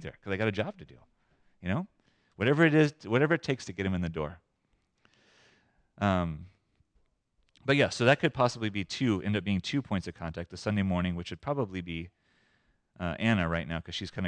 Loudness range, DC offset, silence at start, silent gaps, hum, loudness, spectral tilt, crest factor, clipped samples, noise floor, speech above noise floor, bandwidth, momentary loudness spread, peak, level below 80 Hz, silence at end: 6 LU; under 0.1%; 0 s; none; none; -30 LUFS; -6 dB/octave; 22 dB; under 0.1%; -75 dBFS; 45 dB; 9.8 kHz; 14 LU; -10 dBFS; -56 dBFS; 0 s